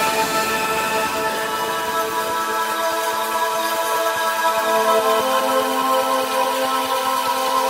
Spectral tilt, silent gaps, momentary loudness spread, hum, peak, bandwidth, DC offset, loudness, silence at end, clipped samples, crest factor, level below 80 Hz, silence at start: -1.5 dB/octave; none; 4 LU; none; -6 dBFS; 16.5 kHz; under 0.1%; -19 LUFS; 0 s; under 0.1%; 14 dB; -58 dBFS; 0 s